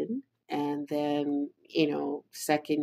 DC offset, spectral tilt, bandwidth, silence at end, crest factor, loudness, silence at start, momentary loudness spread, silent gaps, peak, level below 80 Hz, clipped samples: under 0.1%; -5 dB/octave; 16 kHz; 0 s; 20 dB; -31 LUFS; 0 s; 7 LU; none; -12 dBFS; -86 dBFS; under 0.1%